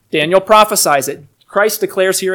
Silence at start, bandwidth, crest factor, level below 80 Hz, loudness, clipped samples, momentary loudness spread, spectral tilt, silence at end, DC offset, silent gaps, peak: 0.15 s; 19.5 kHz; 14 dB; -54 dBFS; -12 LUFS; 0.7%; 12 LU; -2.5 dB/octave; 0 s; under 0.1%; none; 0 dBFS